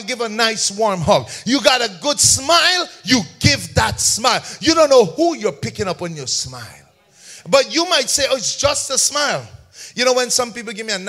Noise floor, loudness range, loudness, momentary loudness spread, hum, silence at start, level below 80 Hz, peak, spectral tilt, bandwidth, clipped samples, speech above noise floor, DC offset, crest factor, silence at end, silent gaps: -45 dBFS; 4 LU; -16 LUFS; 11 LU; none; 0 s; -44 dBFS; 0 dBFS; -2.5 dB/octave; 16 kHz; under 0.1%; 28 dB; under 0.1%; 18 dB; 0 s; none